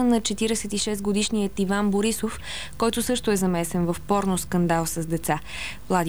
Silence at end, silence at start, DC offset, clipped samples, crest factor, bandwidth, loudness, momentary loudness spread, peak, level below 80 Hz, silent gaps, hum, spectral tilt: 0 s; 0 s; 1%; under 0.1%; 16 dB; 19.5 kHz; -25 LUFS; 6 LU; -8 dBFS; -44 dBFS; none; none; -4.5 dB/octave